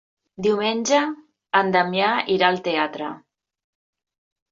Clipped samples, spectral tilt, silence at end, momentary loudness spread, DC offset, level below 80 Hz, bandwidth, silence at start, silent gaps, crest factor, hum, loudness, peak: under 0.1%; -3.5 dB/octave; 1.35 s; 13 LU; under 0.1%; -66 dBFS; 7.8 kHz; 0.4 s; none; 20 dB; none; -21 LUFS; -4 dBFS